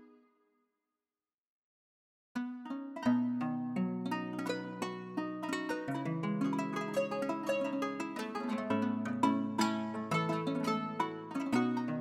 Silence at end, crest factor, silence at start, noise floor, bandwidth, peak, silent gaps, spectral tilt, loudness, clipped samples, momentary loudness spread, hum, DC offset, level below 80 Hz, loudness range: 0 s; 20 dB; 0 s; under -90 dBFS; 15 kHz; -16 dBFS; 1.34-2.35 s; -6 dB/octave; -36 LUFS; under 0.1%; 7 LU; none; under 0.1%; -80 dBFS; 4 LU